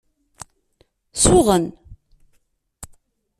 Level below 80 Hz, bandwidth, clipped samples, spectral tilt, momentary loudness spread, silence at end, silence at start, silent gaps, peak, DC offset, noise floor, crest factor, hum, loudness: -38 dBFS; 14 kHz; under 0.1%; -4.5 dB/octave; 28 LU; 0.55 s; 1.15 s; none; -2 dBFS; under 0.1%; -64 dBFS; 22 dB; none; -16 LUFS